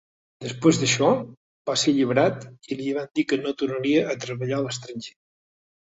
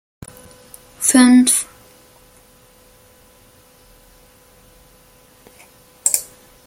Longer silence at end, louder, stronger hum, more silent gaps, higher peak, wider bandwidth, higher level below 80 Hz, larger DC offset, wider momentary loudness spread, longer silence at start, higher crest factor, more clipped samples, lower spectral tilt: first, 0.85 s vs 0.45 s; second, -23 LUFS vs -14 LUFS; neither; first, 1.37-1.65 s vs none; second, -4 dBFS vs 0 dBFS; second, 8.2 kHz vs 17 kHz; second, -64 dBFS vs -56 dBFS; neither; second, 17 LU vs 29 LU; second, 0.4 s vs 1 s; about the same, 20 dB vs 22 dB; neither; first, -4.5 dB/octave vs -1.5 dB/octave